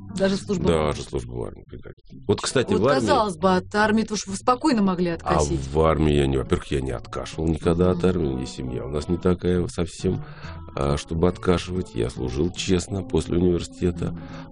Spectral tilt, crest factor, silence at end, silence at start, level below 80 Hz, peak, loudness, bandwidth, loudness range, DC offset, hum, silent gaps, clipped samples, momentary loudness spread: -6 dB/octave; 18 dB; 0 s; 0 s; -36 dBFS; -4 dBFS; -23 LUFS; 10.5 kHz; 4 LU; under 0.1%; none; 1.93-1.97 s; under 0.1%; 11 LU